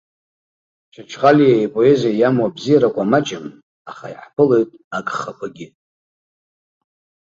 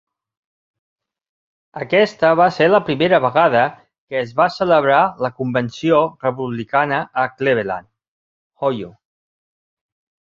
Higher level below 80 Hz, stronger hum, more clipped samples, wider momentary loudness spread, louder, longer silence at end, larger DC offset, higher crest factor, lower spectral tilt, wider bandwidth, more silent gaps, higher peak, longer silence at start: about the same, -60 dBFS vs -58 dBFS; neither; neither; first, 20 LU vs 12 LU; about the same, -16 LUFS vs -17 LUFS; first, 1.7 s vs 1.35 s; neither; about the same, 18 dB vs 18 dB; about the same, -6.5 dB/octave vs -6.5 dB/octave; about the same, 7.8 kHz vs 7.4 kHz; second, 3.63-3.85 s, 4.84-4.91 s vs 3.98-4.07 s, 8.08-8.50 s; about the same, -2 dBFS vs -2 dBFS; second, 1 s vs 1.75 s